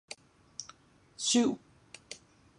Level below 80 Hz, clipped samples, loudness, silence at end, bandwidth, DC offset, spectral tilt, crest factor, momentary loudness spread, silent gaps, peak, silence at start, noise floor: -74 dBFS; under 0.1%; -30 LUFS; 0.45 s; 11.5 kHz; under 0.1%; -2.5 dB/octave; 20 dB; 25 LU; none; -16 dBFS; 0.1 s; -59 dBFS